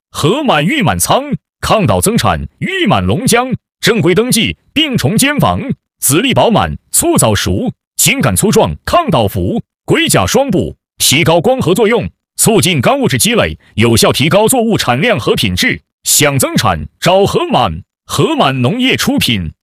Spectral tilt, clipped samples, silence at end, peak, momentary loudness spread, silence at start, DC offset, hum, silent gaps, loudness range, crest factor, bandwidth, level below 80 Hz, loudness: -4 dB/octave; under 0.1%; 0.1 s; 0 dBFS; 7 LU; 0.15 s; under 0.1%; none; 7.87-7.91 s, 15.93-15.98 s; 2 LU; 12 dB; 16.5 kHz; -36 dBFS; -11 LUFS